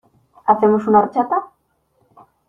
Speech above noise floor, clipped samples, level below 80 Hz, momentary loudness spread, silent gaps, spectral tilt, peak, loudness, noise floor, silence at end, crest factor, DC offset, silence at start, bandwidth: 49 dB; under 0.1%; -60 dBFS; 9 LU; none; -9.5 dB/octave; -2 dBFS; -17 LUFS; -64 dBFS; 1 s; 18 dB; under 0.1%; 0.45 s; 4.6 kHz